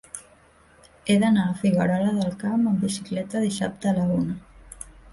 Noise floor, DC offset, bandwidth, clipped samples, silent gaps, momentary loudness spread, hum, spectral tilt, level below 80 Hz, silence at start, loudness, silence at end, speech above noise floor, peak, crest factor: -55 dBFS; under 0.1%; 11.5 kHz; under 0.1%; none; 18 LU; none; -6 dB/octave; -54 dBFS; 0.15 s; -24 LUFS; 0.2 s; 33 dB; -8 dBFS; 16 dB